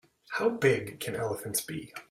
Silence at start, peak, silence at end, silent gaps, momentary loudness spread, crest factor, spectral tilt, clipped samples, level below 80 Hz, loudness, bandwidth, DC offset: 0.3 s; -12 dBFS; 0.1 s; none; 12 LU; 20 dB; -4 dB/octave; under 0.1%; -66 dBFS; -31 LUFS; 16 kHz; under 0.1%